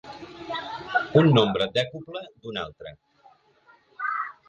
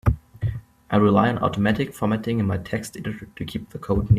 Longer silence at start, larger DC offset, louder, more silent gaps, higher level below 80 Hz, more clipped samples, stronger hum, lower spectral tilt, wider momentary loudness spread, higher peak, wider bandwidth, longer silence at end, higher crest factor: about the same, 0.05 s vs 0.05 s; neither; about the same, -24 LUFS vs -24 LUFS; neither; second, -60 dBFS vs -38 dBFS; neither; neither; about the same, -7 dB/octave vs -7.5 dB/octave; first, 21 LU vs 14 LU; about the same, -6 dBFS vs -4 dBFS; second, 9 kHz vs 14.5 kHz; first, 0.15 s vs 0 s; about the same, 20 dB vs 18 dB